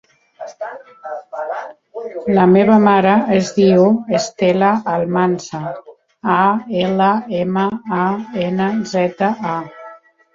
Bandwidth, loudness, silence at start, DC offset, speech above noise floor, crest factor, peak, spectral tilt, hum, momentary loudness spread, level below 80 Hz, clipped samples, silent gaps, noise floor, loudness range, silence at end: 7.6 kHz; -16 LUFS; 0.4 s; under 0.1%; 25 dB; 16 dB; 0 dBFS; -6.5 dB/octave; none; 19 LU; -56 dBFS; under 0.1%; none; -40 dBFS; 5 LU; 0.4 s